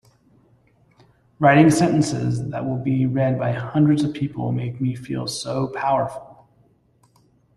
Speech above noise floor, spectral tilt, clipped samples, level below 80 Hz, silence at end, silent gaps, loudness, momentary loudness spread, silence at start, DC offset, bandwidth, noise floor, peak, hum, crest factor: 40 dB; -6.5 dB/octave; under 0.1%; -54 dBFS; 1.25 s; none; -21 LUFS; 11 LU; 1.4 s; under 0.1%; 12.5 kHz; -59 dBFS; -2 dBFS; none; 20 dB